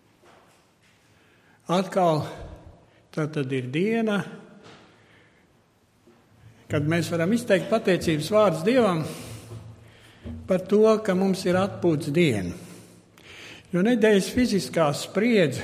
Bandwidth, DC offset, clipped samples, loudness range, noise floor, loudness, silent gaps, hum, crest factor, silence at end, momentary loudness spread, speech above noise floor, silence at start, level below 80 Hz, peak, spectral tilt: 15.5 kHz; under 0.1%; under 0.1%; 7 LU; -62 dBFS; -23 LUFS; none; none; 18 dB; 0 s; 21 LU; 39 dB; 1.7 s; -54 dBFS; -6 dBFS; -6 dB/octave